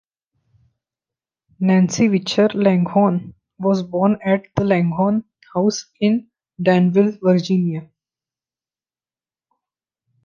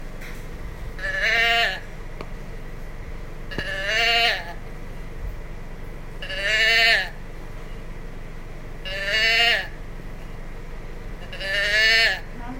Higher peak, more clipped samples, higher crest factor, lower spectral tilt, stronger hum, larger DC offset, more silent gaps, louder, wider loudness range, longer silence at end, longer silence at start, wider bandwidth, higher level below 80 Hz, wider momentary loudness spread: about the same, -2 dBFS vs -4 dBFS; neither; about the same, 18 dB vs 22 dB; first, -6.5 dB/octave vs -2 dB/octave; neither; neither; neither; about the same, -18 LUFS vs -19 LUFS; about the same, 3 LU vs 4 LU; first, 2.4 s vs 0 s; first, 1.6 s vs 0 s; second, 7.4 kHz vs 16 kHz; second, -58 dBFS vs -34 dBFS; second, 8 LU vs 23 LU